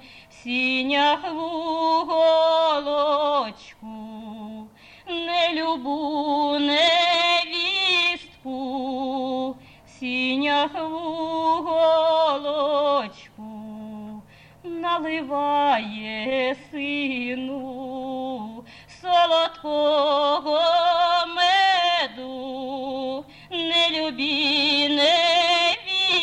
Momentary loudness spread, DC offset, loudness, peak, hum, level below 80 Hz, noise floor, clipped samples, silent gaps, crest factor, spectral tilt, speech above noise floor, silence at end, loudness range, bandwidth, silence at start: 19 LU; under 0.1%; -21 LUFS; -8 dBFS; none; -62 dBFS; -47 dBFS; under 0.1%; none; 14 dB; -3 dB/octave; 23 dB; 0 s; 6 LU; 10.5 kHz; 0.05 s